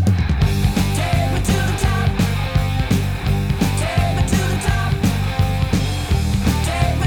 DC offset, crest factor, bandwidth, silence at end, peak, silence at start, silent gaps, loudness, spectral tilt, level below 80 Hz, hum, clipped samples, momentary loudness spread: 0.5%; 14 dB; 19.5 kHz; 0 s; -4 dBFS; 0 s; none; -19 LUFS; -5.5 dB/octave; -24 dBFS; none; under 0.1%; 2 LU